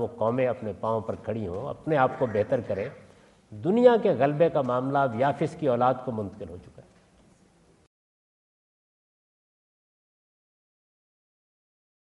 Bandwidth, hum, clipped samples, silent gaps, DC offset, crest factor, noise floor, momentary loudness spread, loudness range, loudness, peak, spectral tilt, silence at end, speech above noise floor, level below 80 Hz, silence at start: 9.8 kHz; none; under 0.1%; none; under 0.1%; 22 dB; -60 dBFS; 13 LU; 8 LU; -26 LUFS; -6 dBFS; -8 dB/octave; 5.35 s; 35 dB; -66 dBFS; 0 s